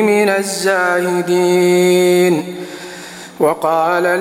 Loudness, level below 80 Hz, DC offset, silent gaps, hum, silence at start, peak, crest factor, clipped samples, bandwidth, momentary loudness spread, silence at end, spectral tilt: -14 LUFS; -64 dBFS; under 0.1%; none; none; 0 s; -2 dBFS; 12 dB; under 0.1%; 16 kHz; 17 LU; 0 s; -4.5 dB/octave